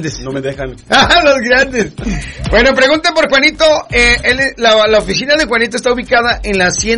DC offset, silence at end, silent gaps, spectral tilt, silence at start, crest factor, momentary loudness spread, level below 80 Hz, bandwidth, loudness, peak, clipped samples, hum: under 0.1%; 0 s; none; -3 dB/octave; 0 s; 12 dB; 12 LU; -28 dBFS; 11 kHz; -10 LUFS; 0 dBFS; under 0.1%; none